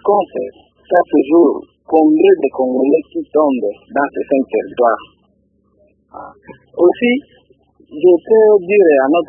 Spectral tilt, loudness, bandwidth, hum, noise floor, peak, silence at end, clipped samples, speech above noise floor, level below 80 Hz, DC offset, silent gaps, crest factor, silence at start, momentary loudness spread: -9 dB/octave; -13 LUFS; 3.4 kHz; none; -58 dBFS; 0 dBFS; 0.05 s; under 0.1%; 45 dB; -58 dBFS; under 0.1%; none; 14 dB; 0.05 s; 13 LU